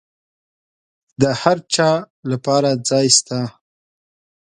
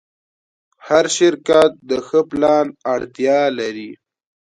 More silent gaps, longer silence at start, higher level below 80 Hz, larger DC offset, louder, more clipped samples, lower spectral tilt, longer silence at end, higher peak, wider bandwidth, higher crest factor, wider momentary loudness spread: first, 2.10-2.23 s vs none; first, 1.2 s vs 0.85 s; about the same, -60 dBFS vs -58 dBFS; neither; about the same, -17 LUFS vs -17 LUFS; neither; about the same, -3.5 dB/octave vs -3.5 dB/octave; first, 1 s vs 0.65 s; about the same, 0 dBFS vs 0 dBFS; about the same, 11.5 kHz vs 11.5 kHz; about the same, 20 dB vs 18 dB; about the same, 12 LU vs 11 LU